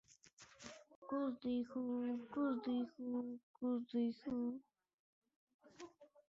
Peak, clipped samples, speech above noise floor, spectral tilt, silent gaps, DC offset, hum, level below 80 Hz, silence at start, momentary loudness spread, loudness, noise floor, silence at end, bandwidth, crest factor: -30 dBFS; under 0.1%; 24 dB; -5.5 dB/octave; 0.95-1.02 s, 3.43-3.54 s, 4.94-5.22 s, 5.36-5.47 s, 5.54-5.59 s; under 0.1%; none; -82 dBFS; 0.4 s; 18 LU; -43 LUFS; -66 dBFS; 0.25 s; 7.6 kHz; 14 dB